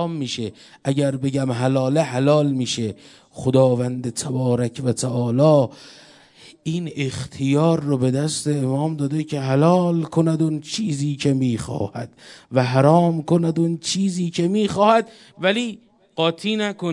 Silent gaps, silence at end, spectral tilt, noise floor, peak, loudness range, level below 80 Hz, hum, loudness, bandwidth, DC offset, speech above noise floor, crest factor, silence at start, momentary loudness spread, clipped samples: none; 0 s; -6 dB/octave; -48 dBFS; 0 dBFS; 3 LU; -60 dBFS; none; -20 LUFS; 11.5 kHz; under 0.1%; 28 dB; 20 dB; 0 s; 10 LU; under 0.1%